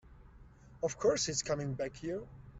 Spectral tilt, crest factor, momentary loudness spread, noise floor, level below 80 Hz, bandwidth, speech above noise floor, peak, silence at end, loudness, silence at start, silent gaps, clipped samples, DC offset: -3.5 dB/octave; 20 dB; 10 LU; -57 dBFS; -58 dBFS; 8.2 kHz; 22 dB; -18 dBFS; 0 s; -35 LUFS; 0.05 s; none; under 0.1%; under 0.1%